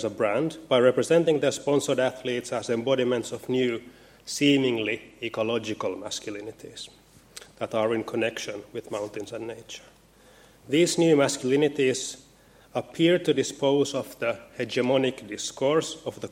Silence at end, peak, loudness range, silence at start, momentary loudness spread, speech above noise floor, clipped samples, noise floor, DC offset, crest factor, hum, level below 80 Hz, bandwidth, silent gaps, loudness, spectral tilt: 0.05 s; -8 dBFS; 7 LU; 0 s; 16 LU; 30 dB; under 0.1%; -55 dBFS; under 0.1%; 18 dB; none; -66 dBFS; 16.5 kHz; none; -26 LUFS; -4.5 dB/octave